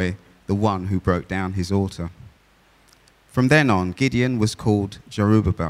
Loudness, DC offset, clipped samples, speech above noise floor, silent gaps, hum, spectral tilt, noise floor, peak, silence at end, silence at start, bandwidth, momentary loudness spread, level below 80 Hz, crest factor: -21 LUFS; under 0.1%; under 0.1%; 36 dB; none; none; -6.5 dB/octave; -56 dBFS; -4 dBFS; 0 s; 0 s; 14 kHz; 11 LU; -42 dBFS; 18 dB